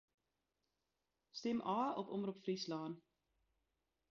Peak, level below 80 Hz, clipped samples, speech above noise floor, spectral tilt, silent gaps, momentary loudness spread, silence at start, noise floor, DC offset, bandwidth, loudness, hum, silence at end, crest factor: -28 dBFS; -84 dBFS; under 0.1%; 48 dB; -5 dB/octave; none; 11 LU; 1.35 s; -89 dBFS; under 0.1%; 7.2 kHz; -43 LUFS; none; 1.15 s; 18 dB